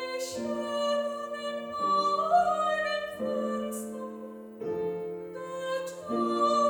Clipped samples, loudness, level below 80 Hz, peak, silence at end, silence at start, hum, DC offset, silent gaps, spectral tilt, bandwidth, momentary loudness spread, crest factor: under 0.1%; -30 LUFS; -70 dBFS; -14 dBFS; 0 s; 0 s; none; under 0.1%; none; -4 dB/octave; 20 kHz; 14 LU; 16 dB